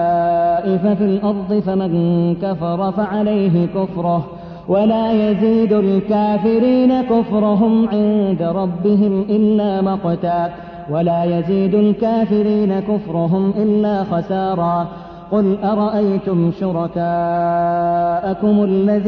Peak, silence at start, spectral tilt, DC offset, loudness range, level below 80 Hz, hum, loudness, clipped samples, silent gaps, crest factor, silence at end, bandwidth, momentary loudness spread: -4 dBFS; 0 s; -10.5 dB/octave; under 0.1%; 3 LU; -48 dBFS; none; -16 LUFS; under 0.1%; none; 12 dB; 0 s; 5.2 kHz; 5 LU